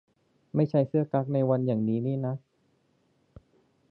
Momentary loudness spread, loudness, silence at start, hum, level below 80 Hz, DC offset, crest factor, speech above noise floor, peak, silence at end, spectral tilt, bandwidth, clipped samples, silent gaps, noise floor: 7 LU; -28 LUFS; 0.55 s; none; -68 dBFS; under 0.1%; 18 dB; 43 dB; -10 dBFS; 1.5 s; -12 dB/octave; 5.6 kHz; under 0.1%; none; -70 dBFS